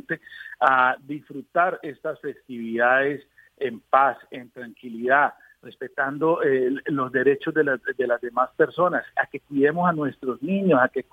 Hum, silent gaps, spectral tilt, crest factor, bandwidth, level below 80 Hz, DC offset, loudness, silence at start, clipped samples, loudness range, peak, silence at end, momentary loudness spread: none; none; -8 dB/octave; 20 dB; 4.8 kHz; -70 dBFS; under 0.1%; -23 LUFS; 0.1 s; under 0.1%; 2 LU; -2 dBFS; 0.1 s; 15 LU